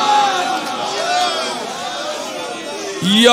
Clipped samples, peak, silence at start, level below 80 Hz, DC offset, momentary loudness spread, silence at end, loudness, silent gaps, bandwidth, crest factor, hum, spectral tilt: under 0.1%; 0 dBFS; 0 s; -62 dBFS; under 0.1%; 11 LU; 0 s; -18 LUFS; none; 16 kHz; 16 dB; none; -3 dB/octave